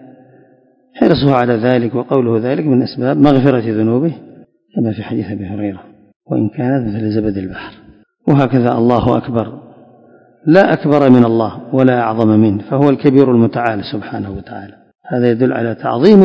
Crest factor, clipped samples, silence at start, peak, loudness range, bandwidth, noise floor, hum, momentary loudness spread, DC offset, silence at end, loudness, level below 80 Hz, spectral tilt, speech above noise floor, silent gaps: 14 dB; 0.6%; 0.95 s; 0 dBFS; 7 LU; 6.2 kHz; -51 dBFS; none; 14 LU; under 0.1%; 0 s; -14 LUFS; -44 dBFS; -9.5 dB/octave; 38 dB; 6.16-6.20 s